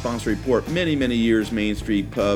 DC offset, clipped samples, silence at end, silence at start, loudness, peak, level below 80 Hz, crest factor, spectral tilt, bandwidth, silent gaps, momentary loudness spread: under 0.1%; under 0.1%; 0 s; 0 s; -22 LUFS; -8 dBFS; -38 dBFS; 14 dB; -6 dB/octave; 16.5 kHz; none; 4 LU